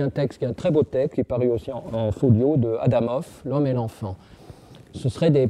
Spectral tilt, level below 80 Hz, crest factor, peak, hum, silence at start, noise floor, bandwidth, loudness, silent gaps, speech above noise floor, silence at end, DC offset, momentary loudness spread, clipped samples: -9 dB/octave; -50 dBFS; 16 dB; -6 dBFS; none; 0 s; -45 dBFS; 11.5 kHz; -23 LUFS; none; 23 dB; 0 s; under 0.1%; 11 LU; under 0.1%